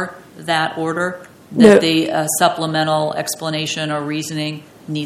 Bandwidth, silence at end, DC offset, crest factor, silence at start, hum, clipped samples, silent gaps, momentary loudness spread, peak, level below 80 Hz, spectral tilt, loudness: 16 kHz; 0 s; under 0.1%; 18 dB; 0 s; none; 0.2%; none; 16 LU; 0 dBFS; -58 dBFS; -4 dB/octave; -17 LUFS